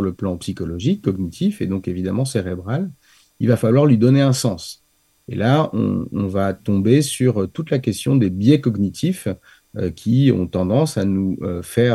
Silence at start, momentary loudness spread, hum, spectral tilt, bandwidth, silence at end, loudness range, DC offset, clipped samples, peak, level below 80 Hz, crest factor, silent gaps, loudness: 0 s; 11 LU; none; -7 dB/octave; 12.5 kHz; 0 s; 2 LU; under 0.1%; under 0.1%; -2 dBFS; -50 dBFS; 16 dB; none; -19 LUFS